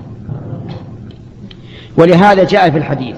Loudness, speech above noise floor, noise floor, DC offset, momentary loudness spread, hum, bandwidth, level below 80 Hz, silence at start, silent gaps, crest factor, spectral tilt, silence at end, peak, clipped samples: -9 LUFS; 24 dB; -33 dBFS; under 0.1%; 24 LU; none; 9.2 kHz; -42 dBFS; 0 s; none; 12 dB; -7.5 dB/octave; 0 s; 0 dBFS; under 0.1%